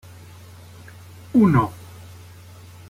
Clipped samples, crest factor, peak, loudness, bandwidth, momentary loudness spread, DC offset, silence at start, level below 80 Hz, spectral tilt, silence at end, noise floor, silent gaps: under 0.1%; 18 dB; -6 dBFS; -19 LUFS; 16 kHz; 27 LU; under 0.1%; 1.35 s; -52 dBFS; -8.5 dB/octave; 1.15 s; -43 dBFS; none